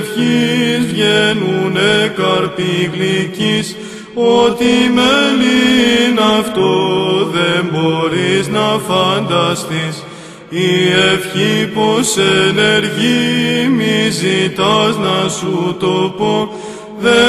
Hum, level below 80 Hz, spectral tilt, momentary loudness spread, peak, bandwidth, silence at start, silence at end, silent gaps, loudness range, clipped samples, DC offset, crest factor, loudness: none; -48 dBFS; -4.5 dB/octave; 7 LU; 0 dBFS; 14 kHz; 0 s; 0 s; none; 3 LU; under 0.1%; under 0.1%; 14 dB; -13 LUFS